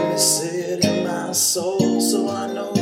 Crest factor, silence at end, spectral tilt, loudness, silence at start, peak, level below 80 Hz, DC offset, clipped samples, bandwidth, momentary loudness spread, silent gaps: 18 dB; 0 s; -3.5 dB/octave; -20 LUFS; 0 s; -4 dBFS; -62 dBFS; under 0.1%; under 0.1%; 17 kHz; 7 LU; none